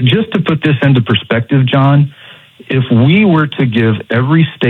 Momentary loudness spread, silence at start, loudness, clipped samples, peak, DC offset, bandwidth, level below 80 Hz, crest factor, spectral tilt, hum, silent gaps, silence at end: 5 LU; 0 s; -11 LUFS; under 0.1%; 0 dBFS; under 0.1%; 4.2 kHz; -50 dBFS; 10 dB; -9 dB/octave; none; none; 0 s